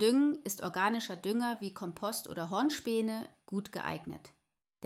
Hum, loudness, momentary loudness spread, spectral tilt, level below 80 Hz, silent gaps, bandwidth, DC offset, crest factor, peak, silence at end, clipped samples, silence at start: none; -35 LUFS; 9 LU; -4.5 dB/octave; -72 dBFS; none; 16.5 kHz; under 0.1%; 18 dB; -16 dBFS; 0 s; under 0.1%; 0 s